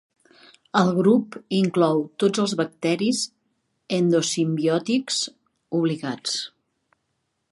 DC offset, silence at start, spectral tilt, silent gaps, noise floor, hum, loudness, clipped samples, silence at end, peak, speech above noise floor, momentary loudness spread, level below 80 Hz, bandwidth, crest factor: under 0.1%; 0.75 s; -5 dB/octave; none; -75 dBFS; none; -23 LUFS; under 0.1%; 1.05 s; -4 dBFS; 53 dB; 8 LU; -72 dBFS; 11.5 kHz; 20 dB